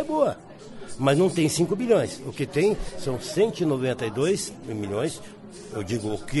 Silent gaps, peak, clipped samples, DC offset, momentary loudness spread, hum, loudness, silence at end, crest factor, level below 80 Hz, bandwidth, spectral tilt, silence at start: none; -8 dBFS; under 0.1%; under 0.1%; 17 LU; none; -25 LUFS; 0 s; 16 dB; -48 dBFS; 11.5 kHz; -5.5 dB/octave; 0 s